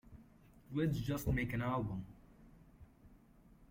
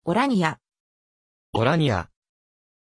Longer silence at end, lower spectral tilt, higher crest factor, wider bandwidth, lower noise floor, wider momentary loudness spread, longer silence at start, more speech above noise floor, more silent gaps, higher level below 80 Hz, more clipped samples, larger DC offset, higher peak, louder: second, 0.05 s vs 0.95 s; about the same, -7 dB/octave vs -6.5 dB/octave; about the same, 20 dB vs 20 dB; first, 16.5 kHz vs 11 kHz; second, -64 dBFS vs under -90 dBFS; first, 20 LU vs 17 LU; about the same, 0.05 s vs 0.05 s; second, 27 dB vs over 68 dB; second, none vs 0.80-1.53 s; about the same, -54 dBFS vs -54 dBFS; neither; neither; second, -22 dBFS vs -6 dBFS; second, -39 LUFS vs -23 LUFS